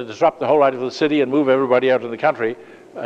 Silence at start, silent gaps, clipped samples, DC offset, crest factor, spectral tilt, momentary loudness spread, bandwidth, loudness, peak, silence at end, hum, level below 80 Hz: 0 s; none; under 0.1%; under 0.1%; 16 dB; -6 dB/octave; 9 LU; 8.2 kHz; -18 LUFS; -2 dBFS; 0 s; none; -68 dBFS